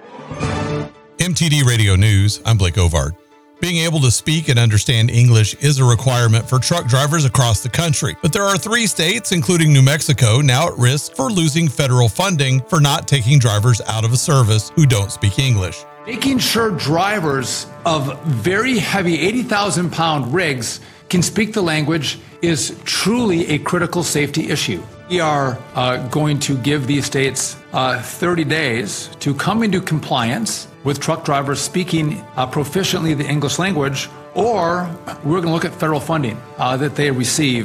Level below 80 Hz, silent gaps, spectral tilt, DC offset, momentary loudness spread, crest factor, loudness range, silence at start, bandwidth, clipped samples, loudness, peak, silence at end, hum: -40 dBFS; none; -4.5 dB/octave; under 0.1%; 8 LU; 14 dB; 5 LU; 0 s; 18.5 kHz; under 0.1%; -16 LUFS; -2 dBFS; 0 s; none